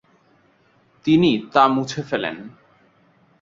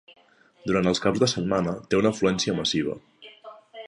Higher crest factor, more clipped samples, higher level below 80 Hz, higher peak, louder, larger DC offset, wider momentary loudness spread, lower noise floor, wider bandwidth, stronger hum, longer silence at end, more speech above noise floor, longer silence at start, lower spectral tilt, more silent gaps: about the same, 20 dB vs 18 dB; neither; second, -60 dBFS vs -54 dBFS; first, -2 dBFS vs -6 dBFS; first, -19 LUFS vs -24 LUFS; neither; second, 12 LU vs 17 LU; first, -59 dBFS vs -47 dBFS; second, 7.6 kHz vs 11 kHz; neither; first, 0.9 s vs 0 s; first, 40 dB vs 23 dB; first, 1.05 s vs 0.65 s; about the same, -6 dB/octave vs -5 dB/octave; neither